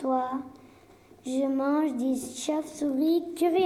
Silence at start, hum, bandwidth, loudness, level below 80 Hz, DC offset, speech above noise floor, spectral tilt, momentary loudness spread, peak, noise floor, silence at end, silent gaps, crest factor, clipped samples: 0 s; none; 15 kHz; -28 LUFS; -68 dBFS; under 0.1%; 28 dB; -4 dB/octave; 8 LU; -14 dBFS; -55 dBFS; 0 s; none; 14 dB; under 0.1%